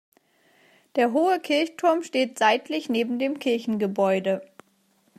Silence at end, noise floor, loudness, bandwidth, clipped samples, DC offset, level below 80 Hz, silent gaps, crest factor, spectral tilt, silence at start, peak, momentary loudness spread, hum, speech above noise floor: 0.75 s; -65 dBFS; -24 LUFS; 15 kHz; under 0.1%; under 0.1%; -78 dBFS; none; 18 dB; -5 dB/octave; 0.95 s; -6 dBFS; 5 LU; none; 42 dB